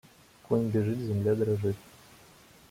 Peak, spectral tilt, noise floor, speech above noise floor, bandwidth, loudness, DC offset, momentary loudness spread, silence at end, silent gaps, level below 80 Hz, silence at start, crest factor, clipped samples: -14 dBFS; -8.5 dB/octave; -56 dBFS; 28 dB; 16 kHz; -30 LUFS; under 0.1%; 5 LU; 0.9 s; none; -64 dBFS; 0.5 s; 18 dB; under 0.1%